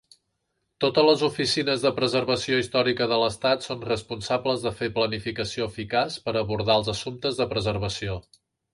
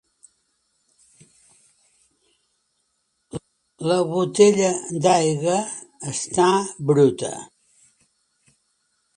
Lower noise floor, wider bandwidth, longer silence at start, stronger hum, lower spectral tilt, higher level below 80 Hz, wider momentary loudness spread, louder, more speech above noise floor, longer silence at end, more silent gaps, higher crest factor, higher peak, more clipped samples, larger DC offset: first, -77 dBFS vs -72 dBFS; about the same, 11.5 kHz vs 11.5 kHz; second, 0.8 s vs 3.35 s; neither; about the same, -4.5 dB/octave vs -5 dB/octave; first, -52 dBFS vs -64 dBFS; second, 7 LU vs 20 LU; second, -25 LUFS vs -20 LUFS; about the same, 52 dB vs 52 dB; second, 0.55 s vs 1.7 s; neither; about the same, 20 dB vs 22 dB; second, -6 dBFS vs -2 dBFS; neither; neither